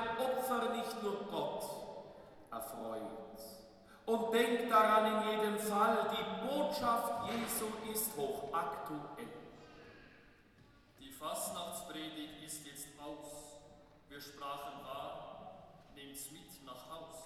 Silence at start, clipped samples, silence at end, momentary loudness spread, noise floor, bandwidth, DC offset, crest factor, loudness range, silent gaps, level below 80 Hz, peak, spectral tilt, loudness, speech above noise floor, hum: 0 s; under 0.1%; 0 s; 22 LU; -64 dBFS; 18 kHz; under 0.1%; 22 dB; 15 LU; none; -70 dBFS; -16 dBFS; -3.5 dB/octave; -37 LUFS; 27 dB; none